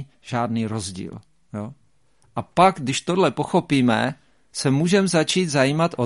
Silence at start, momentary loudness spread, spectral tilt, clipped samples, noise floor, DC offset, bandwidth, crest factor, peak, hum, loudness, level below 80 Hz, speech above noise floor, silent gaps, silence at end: 0 s; 16 LU; -5 dB/octave; under 0.1%; -63 dBFS; 0.1%; 11.5 kHz; 20 dB; -2 dBFS; none; -21 LUFS; -56 dBFS; 42 dB; none; 0 s